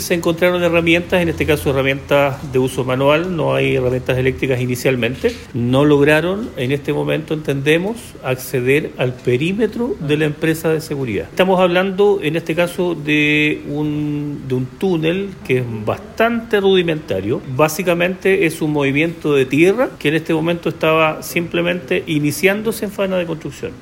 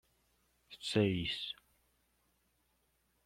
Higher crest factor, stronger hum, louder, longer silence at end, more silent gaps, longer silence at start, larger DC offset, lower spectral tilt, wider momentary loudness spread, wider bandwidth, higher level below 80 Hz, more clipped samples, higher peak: second, 16 dB vs 24 dB; second, none vs 60 Hz at -65 dBFS; first, -17 LUFS vs -36 LUFS; second, 0 s vs 1.75 s; neither; second, 0 s vs 0.7 s; neither; about the same, -6 dB/octave vs -5.5 dB/octave; second, 8 LU vs 12 LU; about the same, 16.5 kHz vs 15.5 kHz; first, -44 dBFS vs -68 dBFS; neither; first, 0 dBFS vs -18 dBFS